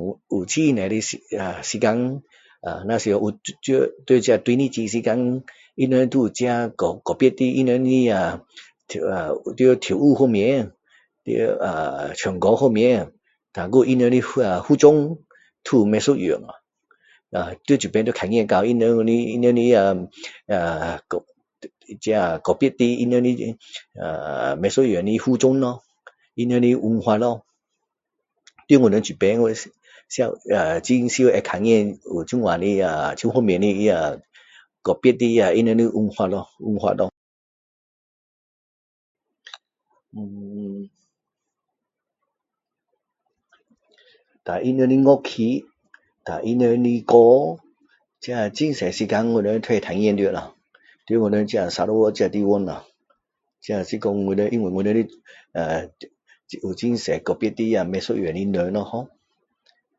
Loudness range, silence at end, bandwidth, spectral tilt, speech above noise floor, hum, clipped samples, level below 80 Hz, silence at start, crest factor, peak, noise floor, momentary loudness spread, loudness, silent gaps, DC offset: 6 LU; 0.95 s; 8 kHz; -6 dB/octave; 65 dB; none; under 0.1%; -54 dBFS; 0 s; 20 dB; 0 dBFS; -84 dBFS; 14 LU; -20 LUFS; 37.17-39.15 s; under 0.1%